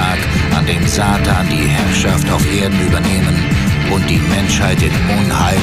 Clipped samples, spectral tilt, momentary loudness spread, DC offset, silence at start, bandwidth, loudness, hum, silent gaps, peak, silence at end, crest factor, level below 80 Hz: under 0.1%; -5 dB/octave; 1 LU; under 0.1%; 0 s; 16 kHz; -13 LUFS; none; none; 0 dBFS; 0 s; 12 dB; -24 dBFS